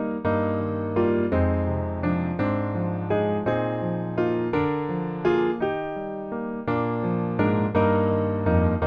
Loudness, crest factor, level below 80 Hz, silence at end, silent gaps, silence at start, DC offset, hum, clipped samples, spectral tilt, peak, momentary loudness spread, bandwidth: -25 LUFS; 16 dB; -44 dBFS; 0 s; none; 0 s; under 0.1%; none; under 0.1%; -10.5 dB/octave; -8 dBFS; 6 LU; 5.4 kHz